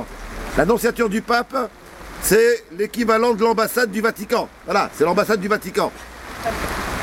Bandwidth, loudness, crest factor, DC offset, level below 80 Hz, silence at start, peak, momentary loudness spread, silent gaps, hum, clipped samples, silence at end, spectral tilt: 16.5 kHz; -20 LUFS; 18 dB; under 0.1%; -40 dBFS; 0 s; -2 dBFS; 12 LU; none; none; under 0.1%; 0 s; -4 dB/octave